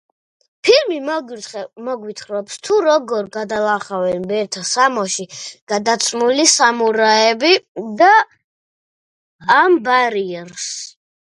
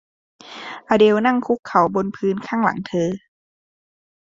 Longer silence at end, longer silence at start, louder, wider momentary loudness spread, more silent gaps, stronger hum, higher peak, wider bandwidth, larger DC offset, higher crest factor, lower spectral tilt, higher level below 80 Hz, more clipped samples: second, 0.45 s vs 1.05 s; first, 0.65 s vs 0.45 s; first, -16 LUFS vs -19 LUFS; second, 15 LU vs 18 LU; first, 5.62-5.67 s, 7.68-7.75 s, 8.44-9.39 s vs 1.59-1.63 s; neither; about the same, 0 dBFS vs -2 dBFS; first, 11.5 kHz vs 7.6 kHz; neither; about the same, 18 dB vs 18 dB; second, -2 dB/octave vs -6.5 dB/octave; second, -66 dBFS vs -60 dBFS; neither